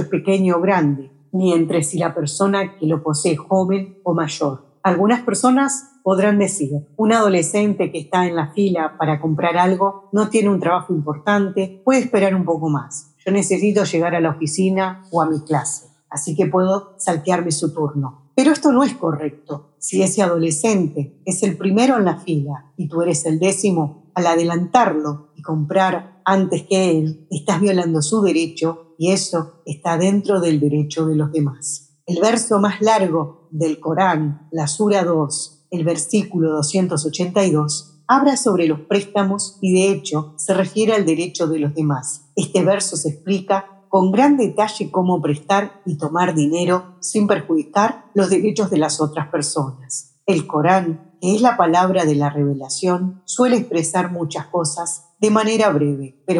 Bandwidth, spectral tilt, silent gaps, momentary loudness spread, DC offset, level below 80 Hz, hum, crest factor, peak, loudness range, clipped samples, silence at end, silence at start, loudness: 12 kHz; -5.5 dB/octave; none; 8 LU; under 0.1%; -72 dBFS; none; 16 dB; -2 dBFS; 2 LU; under 0.1%; 0 s; 0 s; -18 LUFS